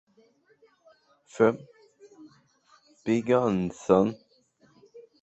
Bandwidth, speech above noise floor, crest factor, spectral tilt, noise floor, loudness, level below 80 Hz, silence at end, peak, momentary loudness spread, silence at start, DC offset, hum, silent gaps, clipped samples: 8.2 kHz; 40 dB; 24 dB; -7 dB/octave; -64 dBFS; -25 LUFS; -62 dBFS; 0.2 s; -6 dBFS; 16 LU; 1.35 s; under 0.1%; none; none; under 0.1%